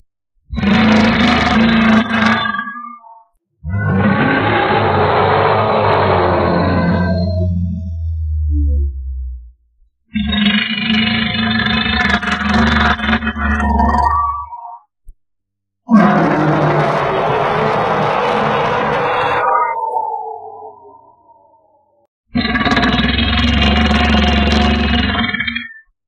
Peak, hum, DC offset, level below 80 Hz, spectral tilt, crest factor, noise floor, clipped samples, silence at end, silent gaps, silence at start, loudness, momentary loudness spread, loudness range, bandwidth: 0 dBFS; none; under 0.1%; -26 dBFS; -6.5 dB/octave; 14 dB; -77 dBFS; under 0.1%; 0.3 s; 22.08-22.24 s; 0.5 s; -14 LUFS; 11 LU; 6 LU; 8.6 kHz